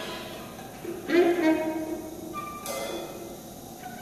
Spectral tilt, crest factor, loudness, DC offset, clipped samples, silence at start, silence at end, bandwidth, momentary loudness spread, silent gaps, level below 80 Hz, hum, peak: -4.5 dB/octave; 20 dB; -29 LUFS; under 0.1%; under 0.1%; 0 s; 0 s; 14 kHz; 18 LU; none; -58 dBFS; none; -10 dBFS